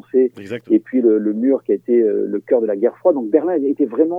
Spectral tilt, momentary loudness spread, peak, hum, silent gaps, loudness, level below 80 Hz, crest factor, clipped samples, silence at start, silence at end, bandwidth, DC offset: -9.5 dB/octave; 3 LU; -2 dBFS; none; none; -17 LUFS; -78 dBFS; 16 dB; under 0.1%; 0.15 s; 0 s; 3.5 kHz; under 0.1%